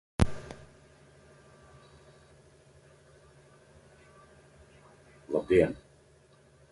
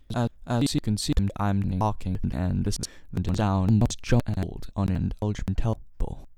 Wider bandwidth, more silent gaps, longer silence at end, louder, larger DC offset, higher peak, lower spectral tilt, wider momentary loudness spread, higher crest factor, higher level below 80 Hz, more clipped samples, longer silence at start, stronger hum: second, 11.5 kHz vs 14.5 kHz; neither; first, 0.95 s vs 0.05 s; about the same, -29 LUFS vs -27 LUFS; neither; about the same, -6 dBFS vs -8 dBFS; about the same, -7 dB/octave vs -6.5 dB/octave; first, 30 LU vs 8 LU; first, 30 dB vs 18 dB; second, -46 dBFS vs -36 dBFS; neither; about the same, 0.2 s vs 0.1 s; neither